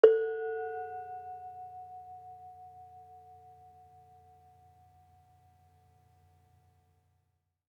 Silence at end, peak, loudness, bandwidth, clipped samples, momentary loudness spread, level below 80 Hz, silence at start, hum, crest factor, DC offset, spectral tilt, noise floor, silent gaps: 4.6 s; -6 dBFS; -36 LUFS; 5 kHz; under 0.1%; 23 LU; -82 dBFS; 0.05 s; none; 30 dB; under 0.1%; -6 dB/octave; -79 dBFS; none